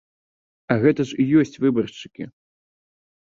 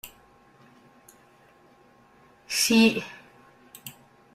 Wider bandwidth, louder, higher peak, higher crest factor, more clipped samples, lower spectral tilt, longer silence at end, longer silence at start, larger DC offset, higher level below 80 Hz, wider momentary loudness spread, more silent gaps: second, 7.6 kHz vs 16 kHz; about the same, -20 LUFS vs -22 LUFS; first, -2 dBFS vs -8 dBFS; about the same, 20 dB vs 22 dB; neither; first, -7.5 dB/octave vs -3 dB/octave; first, 1.05 s vs 0.45 s; first, 0.7 s vs 0.05 s; neither; first, -60 dBFS vs -68 dBFS; second, 18 LU vs 26 LU; neither